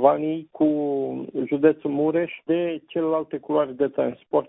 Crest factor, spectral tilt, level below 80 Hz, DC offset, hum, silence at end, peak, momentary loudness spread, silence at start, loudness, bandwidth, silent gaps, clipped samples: 20 dB; -11.5 dB/octave; -66 dBFS; under 0.1%; none; 0.05 s; -4 dBFS; 7 LU; 0 s; -24 LUFS; 3.9 kHz; none; under 0.1%